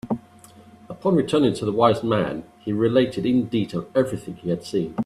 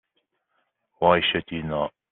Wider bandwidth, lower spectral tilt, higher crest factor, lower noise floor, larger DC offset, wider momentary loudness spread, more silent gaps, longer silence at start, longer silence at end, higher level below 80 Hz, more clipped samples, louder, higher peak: first, 13 kHz vs 4.2 kHz; first, -7 dB/octave vs -2.5 dB/octave; about the same, 20 dB vs 22 dB; second, -48 dBFS vs -75 dBFS; neither; about the same, 11 LU vs 10 LU; neither; second, 0.05 s vs 1 s; second, 0 s vs 0.25 s; about the same, -56 dBFS vs -56 dBFS; neither; about the same, -22 LUFS vs -23 LUFS; about the same, -2 dBFS vs -4 dBFS